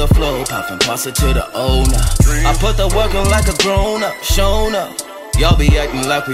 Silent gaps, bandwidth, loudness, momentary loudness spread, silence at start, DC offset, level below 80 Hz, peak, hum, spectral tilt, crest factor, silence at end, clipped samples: none; 16 kHz; -15 LUFS; 5 LU; 0 s; under 0.1%; -16 dBFS; -2 dBFS; none; -4.5 dB/octave; 12 dB; 0 s; under 0.1%